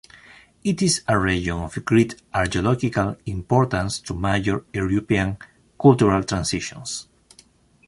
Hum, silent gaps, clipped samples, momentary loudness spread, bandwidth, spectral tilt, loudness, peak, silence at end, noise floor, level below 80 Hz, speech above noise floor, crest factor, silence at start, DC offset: none; none; under 0.1%; 10 LU; 11.5 kHz; -5.5 dB/octave; -22 LUFS; -4 dBFS; 0.85 s; -55 dBFS; -40 dBFS; 34 dB; 18 dB; 0.65 s; under 0.1%